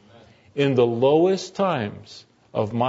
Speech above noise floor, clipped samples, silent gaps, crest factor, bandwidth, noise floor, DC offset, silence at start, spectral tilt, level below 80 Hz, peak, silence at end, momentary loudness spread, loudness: 30 dB; under 0.1%; none; 16 dB; 8 kHz; -51 dBFS; under 0.1%; 0.55 s; -6.5 dB/octave; -62 dBFS; -6 dBFS; 0 s; 14 LU; -22 LUFS